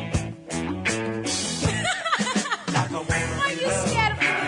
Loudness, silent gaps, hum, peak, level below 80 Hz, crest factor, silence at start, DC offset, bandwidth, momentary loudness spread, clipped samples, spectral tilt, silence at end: -24 LUFS; none; none; -8 dBFS; -44 dBFS; 16 dB; 0 s; under 0.1%; 11 kHz; 7 LU; under 0.1%; -3.5 dB/octave; 0 s